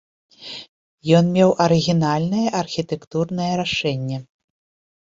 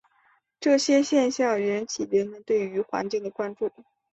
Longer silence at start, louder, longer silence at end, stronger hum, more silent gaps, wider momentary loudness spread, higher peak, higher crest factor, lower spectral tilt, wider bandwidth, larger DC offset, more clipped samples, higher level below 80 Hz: second, 0.4 s vs 0.6 s; first, -19 LUFS vs -25 LUFS; first, 0.9 s vs 0.3 s; neither; first, 0.69-0.98 s, 3.07-3.11 s vs none; first, 18 LU vs 10 LU; first, -2 dBFS vs -10 dBFS; about the same, 18 dB vs 16 dB; first, -6 dB/octave vs -4 dB/octave; about the same, 7.8 kHz vs 8.2 kHz; neither; neither; first, -56 dBFS vs -70 dBFS